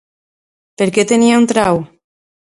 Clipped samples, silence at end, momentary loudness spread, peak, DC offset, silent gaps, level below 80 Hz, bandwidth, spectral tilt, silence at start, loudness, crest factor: under 0.1%; 0.65 s; 8 LU; 0 dBFS; under 0.1%; none; -52 dBFS; 11.5 kHz; -4.5 dB/octave; 0.8 s; -13 LUFS; 16 dB